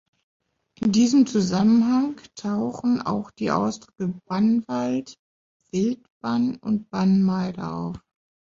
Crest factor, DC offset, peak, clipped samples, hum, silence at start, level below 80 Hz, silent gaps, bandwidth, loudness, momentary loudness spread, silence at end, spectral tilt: 16 dB; under 0.1%; -8 dBFS; under 0.1%; none; 0.8 s; -60 dBFS; 5.19-5.60 s, 6.10-6.21 s; 7.6 kHz; -23 LUFS; 12 LU; 0.45 s; -6.5 dB/octave